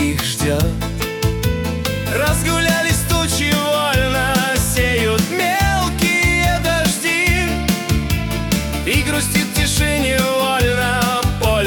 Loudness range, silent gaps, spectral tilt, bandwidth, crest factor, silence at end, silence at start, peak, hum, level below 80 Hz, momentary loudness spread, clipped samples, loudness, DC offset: 2 LU; none; -4 dB/octave; 19 kHz; 12 dB; 0 s; 0 s; -4 dBFS; none; -26 dBFS; 5 LU; under 0.1%; -16 LUFS; under 0.1%